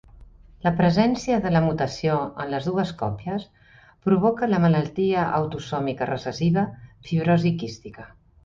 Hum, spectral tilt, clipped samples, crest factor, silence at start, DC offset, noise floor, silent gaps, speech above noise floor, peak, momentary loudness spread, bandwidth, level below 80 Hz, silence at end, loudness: none; -7.5 dB/octave; under 0.1%; 18 dB; 0.2 s; under 0.1%; -47 dBFS; none; 25 dB; -6 dBFS; 10 LU; 7.4 kHz; -50 dBFS; 0.35 s; -23 LUFS